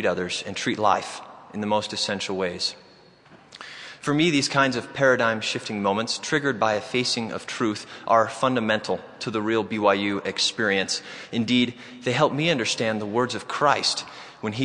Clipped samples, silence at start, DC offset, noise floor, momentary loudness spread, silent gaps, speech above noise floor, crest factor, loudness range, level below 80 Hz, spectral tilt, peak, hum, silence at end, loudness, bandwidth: under 0.1%; 0 s; under 0.1%; -52 dBFS; 11 LU; none; 28 dB; 20 dB; 4 LU; -68 dBFS; -4 dB/octave; -4 dBFS; none; 0 s; -24 LUFS; 11 kHz